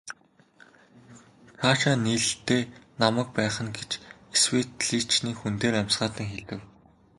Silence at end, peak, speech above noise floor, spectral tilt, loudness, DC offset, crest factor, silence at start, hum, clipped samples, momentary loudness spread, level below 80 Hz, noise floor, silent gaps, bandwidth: 0.55 s; -4 dBFS; 33 dB; -3.5 dB/octave; -26 LUFS; under 0.1%; 24 dB; 0.05 s; none; under 0.1%; 14 LU; -58 dBFS; -59 dBFS; none; 11.5 kHz